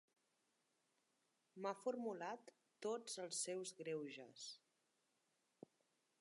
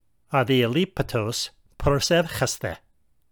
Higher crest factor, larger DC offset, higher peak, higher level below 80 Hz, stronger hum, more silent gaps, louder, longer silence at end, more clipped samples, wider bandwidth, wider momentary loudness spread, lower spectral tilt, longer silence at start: about the same, 20 dB vs 18 dB; neither; second, -32 dBFS vs -6 dBFS; second, under -90 dBFS vs -42 dBFS; neither; neither; second, -49 LUFS vs -24 LUFS; first, 1.65 s vs 0.55 s; neither; second, 11.5 kHz vs over 20 kHz; first, 22 LU vs 11 LU; second, -3 dB/octave vs -4.5 dB/octave; first, 1.55 s vs 0.3 s